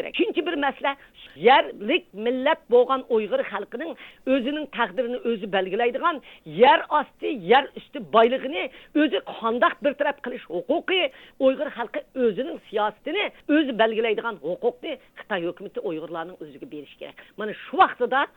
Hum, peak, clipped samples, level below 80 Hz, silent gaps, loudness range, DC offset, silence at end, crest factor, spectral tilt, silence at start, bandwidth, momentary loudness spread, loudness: none; -6 dBFS; under 0.1%; -64 dBFS; none; 5 LU; under 0.1%; 0.1 s; 18 dB; -6.5 dB/octave; 0 s; 17.5 kHz; 15 LU; -24 LUFS